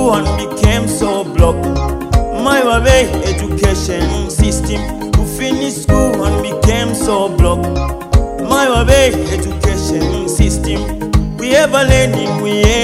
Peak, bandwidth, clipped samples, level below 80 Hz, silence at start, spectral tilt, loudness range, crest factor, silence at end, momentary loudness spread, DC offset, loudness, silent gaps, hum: 0 dBFS; 16 kHz; 0.4%; -18 dBFS; 0 s; -5 dB/octave; 2 LU; 12 dB; 0 s; 7 LU; under 0.1%; -13 LUFS; none; none